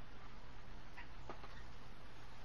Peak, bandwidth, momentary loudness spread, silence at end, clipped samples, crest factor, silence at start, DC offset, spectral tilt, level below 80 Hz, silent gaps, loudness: -34 dBFS; 12 kHz; 4 LU; 0 s; under 0.1%; 18 dB; 0 s; 0.6%; -5 dB/octave; -60 dBFS; none; -57 LUFS